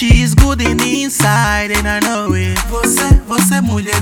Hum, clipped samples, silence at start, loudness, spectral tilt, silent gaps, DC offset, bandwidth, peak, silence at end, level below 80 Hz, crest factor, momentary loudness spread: none; 0.5%; 0 s; -13 LUFS; -4.5 dB/octave; none; under 0.1%; 19.5 kHz; 0 dBFS; 0 s; -18 dBFS; 12 dB; 5 LU